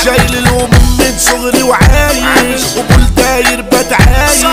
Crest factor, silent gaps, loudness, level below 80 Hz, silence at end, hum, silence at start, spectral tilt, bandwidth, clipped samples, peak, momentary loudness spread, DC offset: 8 dB; none; -8 LUFS; -14 dBFS; 0 s; none; 0 s; -4 dB/octave; 16.5 kHz; 0.4%; 0 dBFS; 3 LU; 0.5%